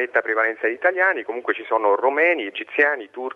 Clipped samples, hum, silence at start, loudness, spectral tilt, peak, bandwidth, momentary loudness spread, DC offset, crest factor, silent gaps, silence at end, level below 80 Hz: under 0.1%; none; 0 s; -20 LUFS; -4.5 dB/octave; -4 dBFS; 6 kHz; 7 LU; under 0.1%; 16 dB; none; 0 s; -78 dBFS